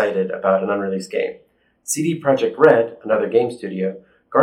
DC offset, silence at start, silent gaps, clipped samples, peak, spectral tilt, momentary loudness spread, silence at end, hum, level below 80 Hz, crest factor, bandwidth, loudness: under 0.1%; 0 s; none; under 0.1%; 0 dBFS; -5 dB/octave; 11 LU; 0 s; none; -70 dBFS; 18 dB; 16.5 kHz; -19 LUFS